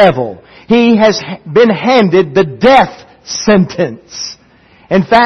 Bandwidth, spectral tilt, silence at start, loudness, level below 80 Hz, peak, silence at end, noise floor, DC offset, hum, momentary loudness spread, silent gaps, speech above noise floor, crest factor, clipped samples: 7.6 kHz; -5.5 dB/octave; 0 s; -10 LUFS; -44 dBFS; 0 dBFS; 0 s; -45 dBFS; under 0.1%; none; 14 LU; none; 35 dB; 10 dB; 0.3%